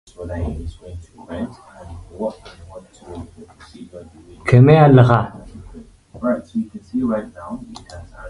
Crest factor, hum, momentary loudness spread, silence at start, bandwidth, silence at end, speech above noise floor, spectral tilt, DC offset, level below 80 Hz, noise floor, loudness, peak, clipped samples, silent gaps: 20 dB; none; 28 LU; 0.2 s; 10.5 kHz; 0 s; 22 dB; -9 dB/octave; under 0.1%; -40 dBFS; -40 dBFS; -17 LUFS; 0 dBFS; under 0.1%; none